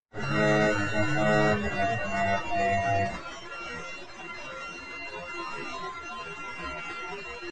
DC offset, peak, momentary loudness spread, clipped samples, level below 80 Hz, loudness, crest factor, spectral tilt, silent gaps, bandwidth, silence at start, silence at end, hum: 0.5%; -12 dBFS; 14 LU; under 0.1%; -50 dBFS; -29 LUFS; 18 dB; -5.5 dB/octave; none; 9.6 kHz; 0 s; 0 s; none